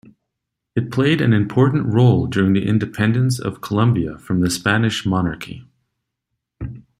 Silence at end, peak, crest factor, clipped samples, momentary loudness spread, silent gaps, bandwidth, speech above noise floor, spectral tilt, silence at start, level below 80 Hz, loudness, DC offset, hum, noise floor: 0.2 s; -2 dBFS; 16 dB; under 0.1%; 14 LU; none; 15 kHz; 62 dB; -6.5 dB/octave; 0.75 s; -48 dBFS; -18 LUFS; under 0.1%; none; -80 dBFS